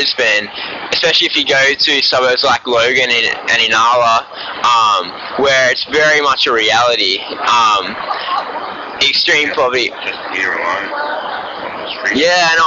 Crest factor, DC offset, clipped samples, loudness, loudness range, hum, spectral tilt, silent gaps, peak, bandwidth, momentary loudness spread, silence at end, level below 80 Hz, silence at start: 10 dB; under 0.1%; under 0.1%; -12 LUFS; 4 LU; none; 1 dB/octave; none; -4 dBFS; 7.6 kHz; 11 LU; 0 s; -52 dBFS; 0 s